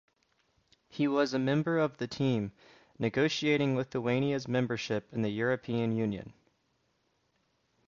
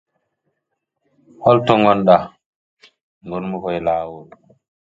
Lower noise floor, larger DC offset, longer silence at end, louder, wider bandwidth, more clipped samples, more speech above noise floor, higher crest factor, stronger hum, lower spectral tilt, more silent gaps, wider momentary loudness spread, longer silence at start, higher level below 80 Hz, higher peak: about the same, -75 dBFS vs -76 dBFS; neither; first, 1.55 s vs 0.65 s; second, -31 LUFS vs -16 LUFS; about the same, 7.4 kHz vs 7.6 kHz; neither; second, 45 dB vs 60 dB; about the same, 18 dB vs 20 dB; neither; second, -6.5 dB/octave vs -8 dB/octave; second, none vs 2.46-2.77 s, 3.03-3.21 s; second, 7 LU vs 16 LU; second, 0.95 s vs 1.4 s; second, -68 dBFS vs -54 dBFS; second, -14 dBFS vs 0 dBFS